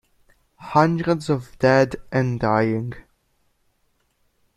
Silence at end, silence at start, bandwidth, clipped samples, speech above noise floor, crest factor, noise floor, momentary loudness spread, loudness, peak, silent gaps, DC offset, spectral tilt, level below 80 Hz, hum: 1.55 s; 0.6 s; 12 kHz; under 0.1%; 47 dB; 20 dB; -67 dBFS; 13 LU; -21 LUFS; -2 dBFS; none; under 0.1%; -7.5 dB/octave; -52 dBFS; none